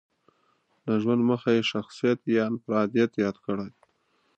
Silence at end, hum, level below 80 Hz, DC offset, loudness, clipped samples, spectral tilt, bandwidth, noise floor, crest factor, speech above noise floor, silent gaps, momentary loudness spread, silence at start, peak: 0.7 s; none; -68 dBFS; under 0.1%; -26 LUFS; under 0.1%; -6.5 dB/octave; 8.2 kHz; -69 dBFS; 16 dB; 44 dB; none; 9 LU; 0.85 s; -10 dBFS